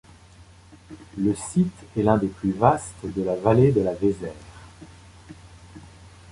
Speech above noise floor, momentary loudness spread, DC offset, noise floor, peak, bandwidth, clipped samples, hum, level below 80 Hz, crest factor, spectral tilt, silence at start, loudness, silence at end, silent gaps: 27 dB; 19 LU; under 0.1%; -49 dBFS; -2 dBFS; 11.5 kHz; under 0.1%; none; -48 dBFS; 22 dB; -7.5 dB/octave; 0.4 s; -23 LUFS; 0 s; none